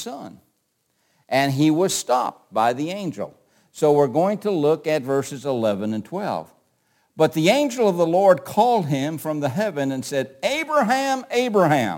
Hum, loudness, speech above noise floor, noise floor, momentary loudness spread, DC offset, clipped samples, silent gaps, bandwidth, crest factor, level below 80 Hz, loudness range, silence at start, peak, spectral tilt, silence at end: none; -21 LUFS; 50 dB; -70 dBFS; 10 LU; under 0.1%; under 0.1%; none; 17 kHz; 18 dB; -68 dBFS; 3 LU; 0 s; -2 dBFS; -5 dB/octave; 0 s